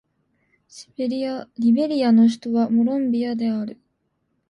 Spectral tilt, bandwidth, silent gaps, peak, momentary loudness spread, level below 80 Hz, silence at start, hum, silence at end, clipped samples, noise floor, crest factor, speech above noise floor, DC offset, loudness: -7 dB/octave; 9.6 kHz; none; -8 dBFS; 12 LU; -68 dBFS; 0.75 s; none; 0.75 s; under 0.1%; -71 dBFS; 14 dB; 51 dB; under 0.1%; -21 LUFS